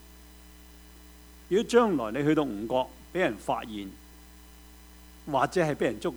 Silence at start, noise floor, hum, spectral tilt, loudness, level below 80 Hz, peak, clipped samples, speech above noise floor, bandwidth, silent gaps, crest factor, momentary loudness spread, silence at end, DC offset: 0.05 s; -51 dBFS; none; -5.5 dB/octave; -28 LUFS; -54 dBFS; -10 dBFS; under 0.1%; 24 dB; over 20 kHz; none; 20 dB; 13 LU; 0 s; under 0.1%